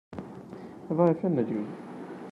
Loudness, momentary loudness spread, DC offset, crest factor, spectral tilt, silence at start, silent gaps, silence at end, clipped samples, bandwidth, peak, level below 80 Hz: -28 LUFS; 19 LU; under 0.1%; 20 dB; -10 dB/octave; 0.1 s; none; 0 s; under 0.1%; 6.8 kHz; -10 dBFS; -70 dBFS